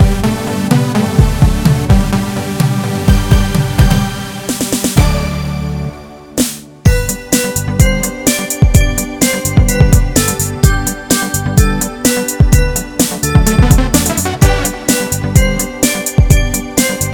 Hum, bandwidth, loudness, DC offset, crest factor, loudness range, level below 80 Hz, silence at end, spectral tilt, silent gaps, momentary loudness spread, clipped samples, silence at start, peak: none; over 20 kHz; -13 LUFS; under 0.1%; 12 dB; 3 LU; -16 dBFS; 0 s; -5 dB/octave; none; 6 LU; 0.5%; 0 s; 0 dBFS